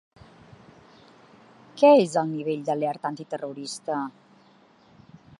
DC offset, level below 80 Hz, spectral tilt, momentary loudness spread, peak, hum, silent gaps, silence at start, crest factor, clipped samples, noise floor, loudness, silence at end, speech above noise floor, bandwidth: under 0.1%; -72 dBFS; -5.5 dB/octave; 17 LU; -4 dBFS; none; none; 1.75 s; 22 dB; under 0.1%; -57 dBFS; -24 LUFS; 1.3 s; 34 dB; 11.5 kHz